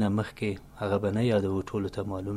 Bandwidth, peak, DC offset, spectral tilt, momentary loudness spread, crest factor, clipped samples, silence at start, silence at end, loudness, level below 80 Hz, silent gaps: 13.5 kHz; -12 dBFS; under 0.1%; -7.5 dB/octave; 8 LU; 16 dB; under 0.1%; 0 s; 0 s; -30 LUFS; -54 dBFS; none